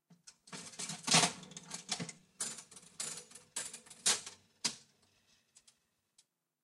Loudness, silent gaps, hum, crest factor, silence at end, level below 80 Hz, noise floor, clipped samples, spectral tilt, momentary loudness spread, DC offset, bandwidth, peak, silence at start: -36 LUFS; none; none; 26 dB; 1.85 s; -82 dBFS; -75 dBFS; under 0.1%; -1 dB/octave; 21 LU; under 0.1%; 14 kHz; -14 dBFS; 0.1 s